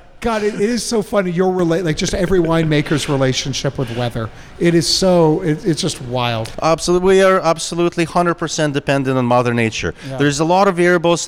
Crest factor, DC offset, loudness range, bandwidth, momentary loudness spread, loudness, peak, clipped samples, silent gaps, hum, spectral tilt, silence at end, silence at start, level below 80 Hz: 14 dB; under 0.1%; 2 LU; 16 kHz; 8 LU; -16 LUFS; -2 dBFS; under 0.1%; none; none; -5 dB/octave; 0 s; 0.15 s; -38 dBFS